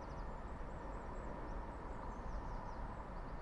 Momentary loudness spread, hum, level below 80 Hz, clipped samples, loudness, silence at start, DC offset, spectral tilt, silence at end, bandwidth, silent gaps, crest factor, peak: 2 LU; none; -48 dBFS; under 0.1%; -49 LUFS; 0 s; under 0.1%; -7.5 dB/octave; 0 s; 10.5 kHz; none; 12 dB; -34 dBFS